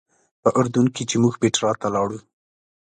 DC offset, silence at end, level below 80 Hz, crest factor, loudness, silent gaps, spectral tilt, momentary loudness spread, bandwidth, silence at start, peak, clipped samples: under 0.1%; 0.7 s; -58 dBFS; 18 dB; -21 LUFS; none; -5 dB/octave; 6 LU; 9.6 kHz; 0.45 s; -4 dBFS; under 0.1%